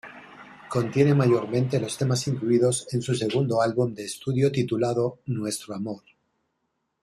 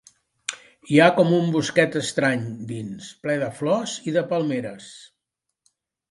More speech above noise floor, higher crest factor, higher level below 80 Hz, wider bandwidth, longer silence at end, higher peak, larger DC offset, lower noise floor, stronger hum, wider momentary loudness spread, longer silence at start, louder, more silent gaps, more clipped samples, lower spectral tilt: second, 53 dB vs 60 dB; about the same, 18 dB vs 22 dB; first, -62 dBFS vs -68 dBFS; first, 13 kHz vs 11.5 kHz; about the same, 1.05 s vs 1.1 s; second, -8 dBFS vs -2 dBFS; neither; second, -77 dBFS vs -82 dBFS; neither; second, 11 LU vs 17 LU; second, 0.05 s vs 0.5 s; second, -25 LUFS vs -22 LUFS; neither; neither; about the same, -6 dB/octave vs -5.5 dB/octave